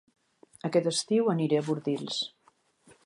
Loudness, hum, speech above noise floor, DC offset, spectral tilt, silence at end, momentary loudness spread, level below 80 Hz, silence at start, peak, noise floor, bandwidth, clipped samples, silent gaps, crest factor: -29 LUFS; none; 39 dB; under 0.1%; -5 dB/octave; 0.8 s; 7 LU; -80 dBFS; 0.65 s; -12 dBFS; -67 dBFS; 11.5 kHz; under 0.1%; none; 18 dB